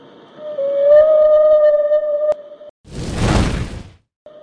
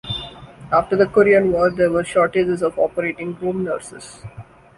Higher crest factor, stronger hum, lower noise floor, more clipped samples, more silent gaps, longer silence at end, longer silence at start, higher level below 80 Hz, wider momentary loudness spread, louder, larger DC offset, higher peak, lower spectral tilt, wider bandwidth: about the same, 14 dB vs 16 dB; neither; about the same, -34 dBFS vs -37 dBFS; neither; first, 2.70-2.84 s vs none; first, 0.55 s vs 0.35 s; first, 0.4 s vs 0.05 s; first, -30 dBFS vs -48 dBFS; second, 19 LU vs 22 LU; first, -14 LUFS vs -18 LUFS; neither; about the same, -2 dBFS vs -2 dBFS; about the same, -6.5 dB/octave vs -6 dB/octave; about the same, 10.5 kHz vs 11.5 kHz